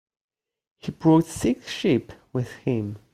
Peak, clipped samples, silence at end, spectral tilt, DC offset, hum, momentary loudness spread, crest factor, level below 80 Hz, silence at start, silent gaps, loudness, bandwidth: -6 dBFS; under 0.1%; 0.15 s; -6.5 dB/octave; under 0.1%; none; 13 LU; 20 dB; -56 dBFS; 0.85 s; none; -24 LUFS; 15 kHz